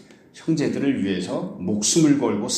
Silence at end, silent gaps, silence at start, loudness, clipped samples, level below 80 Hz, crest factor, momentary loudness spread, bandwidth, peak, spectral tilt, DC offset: 0 s; none; 0.35 s; -22 LUFS; under 0.1%; -62 dBFS; 16 dB; 10 LU; 14 kHz; -6 dBFS; -4.5 dB/octave; under 0.1%